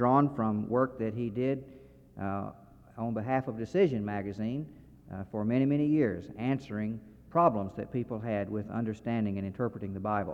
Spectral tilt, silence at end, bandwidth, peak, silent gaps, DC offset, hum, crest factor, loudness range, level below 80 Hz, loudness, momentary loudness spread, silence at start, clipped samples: -9.5 dB/octave; 0 s; 7.8 kHz; -12 dBFS; none; under 0.1%; none; 20 dB; 3 LU; -62 dBFS; -32 LUFS; 12 LU; 0 s; under 0.1%